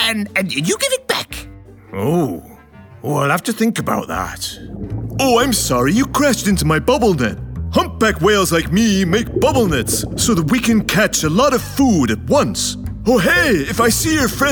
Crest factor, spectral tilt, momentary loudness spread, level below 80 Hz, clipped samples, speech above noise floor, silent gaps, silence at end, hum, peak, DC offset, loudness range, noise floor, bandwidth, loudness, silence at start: 14 dB; -4 dB/octave; 9 LU; -34 dBFS; under 0.1%; 25 dB; none; 0 s; none; -2 dBFS; under 0.1%; 5 LU; -40 dBFS; over 20 kHz; -16 LUFS; 0 s